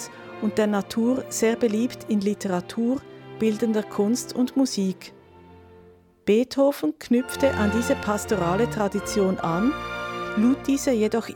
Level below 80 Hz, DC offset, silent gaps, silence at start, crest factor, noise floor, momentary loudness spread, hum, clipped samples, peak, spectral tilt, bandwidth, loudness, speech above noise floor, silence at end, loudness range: -52 dBFS; under 0.1%; none; 0 s; 16 dB; -52 dBFS; 7 LU; none; under 0.1%; -8 dBFS; -5.5 dB/octave; 19 kHz; -24 LUFS; 29 dB; 0 s; 2 LU